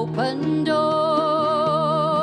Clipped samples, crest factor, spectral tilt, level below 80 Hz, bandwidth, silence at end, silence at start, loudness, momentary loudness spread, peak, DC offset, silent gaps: under 0.1%; 12 dB; -7 dB/octave; -58 dBFS; 11 kHz; 0 s; 0 s; -20 LUFS; 3 LU; -8 dBFS; under 0.1%; none